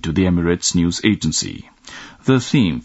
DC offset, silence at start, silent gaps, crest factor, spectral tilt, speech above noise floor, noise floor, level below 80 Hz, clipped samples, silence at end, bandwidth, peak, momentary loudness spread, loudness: under 0.1%; 0.05 s; none; 18 dB; -4.5 dB/octave; 21 dB; -38 dBFS; -44 dBFS; under 0.1%; 0 s; 8.2 kHz; 0 dBFS; 20 LU; -18 LUFS